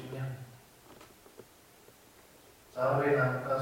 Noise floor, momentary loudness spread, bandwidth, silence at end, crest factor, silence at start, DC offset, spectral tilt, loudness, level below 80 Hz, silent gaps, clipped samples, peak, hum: -59 dBFS; 27 LU; 16.5 kHz; 0 s; 18 dB; 0 s; under 0.1%; -7 dB/octave; -31 LUFS; -68 dBFS; none; under 0.1%; -16 dBFS; none